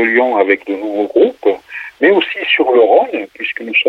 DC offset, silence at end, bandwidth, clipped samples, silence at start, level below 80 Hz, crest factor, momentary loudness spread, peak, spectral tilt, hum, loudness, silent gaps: under 0.1%; 0 s; 5.6 kHz; under 0.1%; 0 s; -60 dBFS; 12 dB; 11 LU; -2 dBFS; -5.5 dB/octave; none; -13 LUFS; none